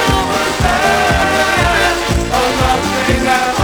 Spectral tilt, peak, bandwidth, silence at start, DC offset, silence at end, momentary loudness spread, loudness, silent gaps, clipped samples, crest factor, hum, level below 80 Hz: -4 dB/octave; 0 dBFS; over 20 kHz; 0 s; under 0.1%; 0 s; 3 LU; -13 LUFS; none; under 0.1%; 14 dB; none; -24 dBFS